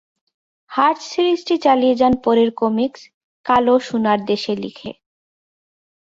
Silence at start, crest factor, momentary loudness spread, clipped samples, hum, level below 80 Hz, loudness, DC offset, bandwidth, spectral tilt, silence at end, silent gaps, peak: 0.7 s; 16 dB; 11 LU; under 0.1%; none; -54 dBFS; -17 LUFS; under 0.1%; 7.8 kHz; -5.5 dB/octave; 1.1 s; 3.14-3.44 s; -2 dBFS